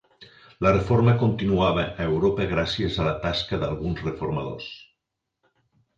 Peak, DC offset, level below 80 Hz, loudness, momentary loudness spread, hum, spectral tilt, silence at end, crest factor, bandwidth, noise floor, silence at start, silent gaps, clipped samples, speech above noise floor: -6 dBFS; under 0.1%; -42 dBFS; -24 LUFS; 10 LU; none; -7.5 dB/octave; 1.15 s; 20 dB; 7.6 kHz; -82 dBFS; 0.2 s; none; under 0.1%; 58 dB